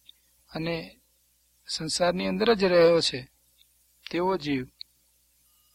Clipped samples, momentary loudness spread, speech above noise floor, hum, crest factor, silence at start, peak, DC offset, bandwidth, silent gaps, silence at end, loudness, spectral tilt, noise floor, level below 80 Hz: under 0.1%; 24 LU; 42 dB; 60 Hz at -55 dBFS; 20 dB; 0.55 s; -8 dBFS; under 0.1%; 15.5 kHz; none; 1.1 s; -25 LUFS; -4.5 dB/octave; -67 dBFS; -58 dBFS